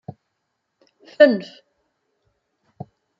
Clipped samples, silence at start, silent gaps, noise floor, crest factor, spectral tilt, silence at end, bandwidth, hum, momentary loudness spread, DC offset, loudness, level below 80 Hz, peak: under 0.1%; 1.2 s; none; -76 dBFS; 22 dB; -7 dB/octave; 1.75 s; 6 kHz; none; 26 LU; under 0.1%; -17 LUFS; -74 dBFS; -2 dBFS